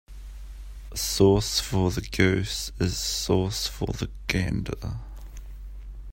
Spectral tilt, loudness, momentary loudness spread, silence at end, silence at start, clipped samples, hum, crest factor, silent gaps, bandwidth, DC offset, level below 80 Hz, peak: -4.5 dB/octave; -26 LUFS; 22 LU; 0 s; 0.1 s; under 0.1%; none; 22 dB; none; 16.5 kHz; under 0.1%; -38 dBFS; -4 dBFS